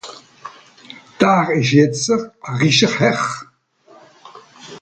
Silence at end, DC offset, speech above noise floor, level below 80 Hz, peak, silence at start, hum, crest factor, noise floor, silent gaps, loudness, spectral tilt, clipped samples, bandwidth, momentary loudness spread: 0.05 s; under 0.1%; 35 dB; -58 dBFS; 0 dBFS; 0.05 s; none; 18 dB; -51 dBFS; none; -16 LUFS; -4.5 dB/octave; under 0.1%; 9.2 kHz; 24 LU